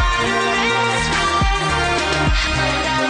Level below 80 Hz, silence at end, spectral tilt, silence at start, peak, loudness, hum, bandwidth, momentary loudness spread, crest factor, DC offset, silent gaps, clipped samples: -26 dBFS; 0 s; -3.5 dB/octave; 0 s; -6 dBFS; -17 LUFS; none; 10 kHz; 1 LU; 12 dB; under 0.1%; none; under 0.1%